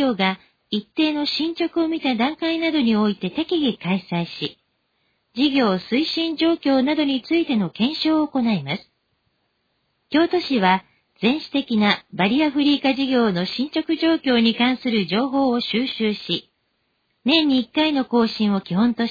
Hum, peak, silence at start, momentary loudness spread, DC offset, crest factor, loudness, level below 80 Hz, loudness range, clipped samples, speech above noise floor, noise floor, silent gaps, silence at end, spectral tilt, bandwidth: none; -2 dBFS; 0 s; 7 LU; under 0.1%; 20 dB; -21 LUFS; -60 dBFS; 3 LU; under 0.1%; 50 dB; -70 dBFS; none; 0 s; -7 dB/octave; 5 kHz